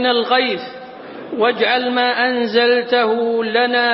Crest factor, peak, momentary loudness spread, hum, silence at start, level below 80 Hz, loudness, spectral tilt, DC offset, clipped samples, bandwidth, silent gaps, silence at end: 14 dB; -2 dBFS; 15 LU; none; 0 s; -66 dBFS; -16 LUFS; -7.5 dB/octave; under 0.1%; under 0.1%; 5.8 kHz; none; 0 s